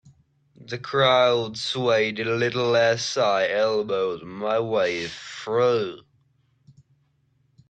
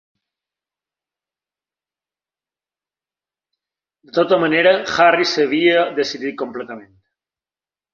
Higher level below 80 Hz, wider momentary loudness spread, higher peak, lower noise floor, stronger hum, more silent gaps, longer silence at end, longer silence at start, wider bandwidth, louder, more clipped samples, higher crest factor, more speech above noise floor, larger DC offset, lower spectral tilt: about the same, -64 dBFS vs -64 dBFS; second, 11 LU vs 14 LU; second, -6 dBFS vs -2 dBFS; second, -66 dBFS vs under -90 dBFS; neither; neither; first, 1.7 s vs 1.1 s; second, 0.6 s vs 4.15 s; first, 9.2 kHz vs 7.4 kHz; second, -23 LUFS vs -16 LUFS; neither; about the same, 18 dB vs 20 dB; second, 44 dB vs over 74 dB; neither; about the same, -4 dB/octave vs -4 dB/octave